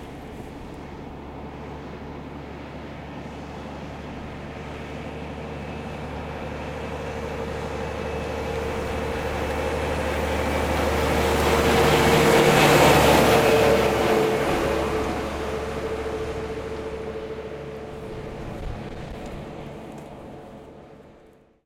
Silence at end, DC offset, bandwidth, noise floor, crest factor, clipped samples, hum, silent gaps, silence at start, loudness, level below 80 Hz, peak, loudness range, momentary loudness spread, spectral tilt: 0.55 s; under 0.1%; 16.5 kHz; -53 dBFS; 20 dB; under 0.1%; none; none; 0 s; -22 LUFS; -38 dBFS; -4 dBFS; 19 LU; 21 LU; -5 dB/octave